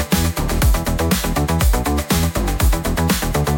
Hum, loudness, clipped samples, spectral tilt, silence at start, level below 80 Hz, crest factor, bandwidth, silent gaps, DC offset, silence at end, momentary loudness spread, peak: none; -18 LUFS; under 0.1%; -5 dB/octave; 0 s; -22 dBFS; 12 dB; 17 kHz; none; under 0.1%; 0 s; 2 LU; -4 dBFS